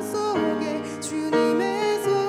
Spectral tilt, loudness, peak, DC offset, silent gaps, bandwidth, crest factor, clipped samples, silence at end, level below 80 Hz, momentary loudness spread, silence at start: -4.5 dB/octave; -24 LUFS; -10 dBFS; under 0.1%; none; 14 kHz; 14 dB; under 0.1%; 0 s; -74 dBFS; 7 LU; 0 s